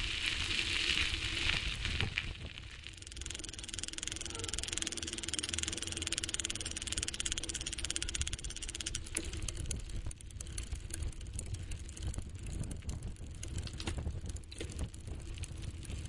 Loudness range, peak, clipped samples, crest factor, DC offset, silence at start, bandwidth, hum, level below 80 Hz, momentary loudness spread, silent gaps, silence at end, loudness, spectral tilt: 8 LU; -12 dBFS; under 0.1%; 28 dB; under 0.1%; 0 s; 11.5 kHz; none; -46 dBFS; 13 LU; none; 0 s; -38 LUFS; -2 dB/octave